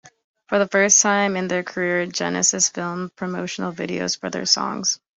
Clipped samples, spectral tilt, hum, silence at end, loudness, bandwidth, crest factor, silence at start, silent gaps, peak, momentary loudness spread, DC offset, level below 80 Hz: under 0.1%; -2 dB/octave; none; 0.2 s; -20 LUFS; 8.2 kHz; 20 dB; 0.05 s; 0.24-0.34 s; -2 dBFS; 13 LU; under 0.1%; -64 dBFS